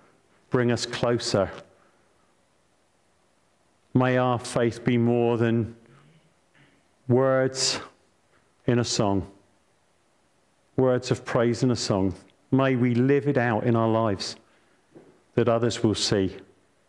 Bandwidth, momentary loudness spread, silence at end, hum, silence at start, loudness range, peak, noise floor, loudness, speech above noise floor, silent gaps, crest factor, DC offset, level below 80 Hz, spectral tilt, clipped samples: 11.5 kHz; 10 LU; 0.5 s; none; 0.5 s; 5 LU; -10 dBFS; -66 dBFS; -24 LUFS; 43 dB; none; 16 dB; under 0.1%; -60 dBFS; -5.5 dB/octave; under 0.1%